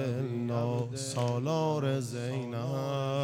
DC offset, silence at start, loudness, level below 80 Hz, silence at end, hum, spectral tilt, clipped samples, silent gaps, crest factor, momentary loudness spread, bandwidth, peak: under 0.1%; 0 s; -32 LUFS; -72 dBFS; 0 s; none; -6.5 dB/octave; under 0.1%; none; 14 dB; 5 LU; 15.5 kHz; -18 dBFS